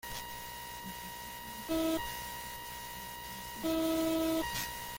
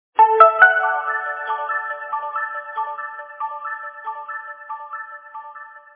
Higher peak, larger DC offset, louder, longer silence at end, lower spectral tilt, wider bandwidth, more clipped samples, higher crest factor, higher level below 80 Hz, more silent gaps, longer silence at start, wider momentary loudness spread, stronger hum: second, -20 dBFS vs 0 dBFS; neither; second, -37 LUFS vs -18 LUFS; second, 0 s vs 0.15 s; about the same, -3.5 dB/octave vs -3.5 dB/octave; first, 17 kHz vs 4 kHz; neither; about the same, 16 dB vs 20 dB; first, -56 dBFS vs -78 dBFS; neither; about the same, 0.05 s vs 0.15 s; second, 11 LU vs 22 LU; first, 60 Hz at -60 dBFS vs none